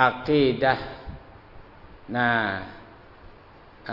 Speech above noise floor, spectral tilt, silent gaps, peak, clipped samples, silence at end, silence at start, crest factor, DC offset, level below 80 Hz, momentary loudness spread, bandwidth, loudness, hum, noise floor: 27 dB; -8 dB/octave; none; -4 dBFS; under 0.1%; 0 s; 0 s; 24 dB; under 0.1%; -50 dBFS; 22 LU; 6 kHz; -24 LUFS; none; -49 dBFS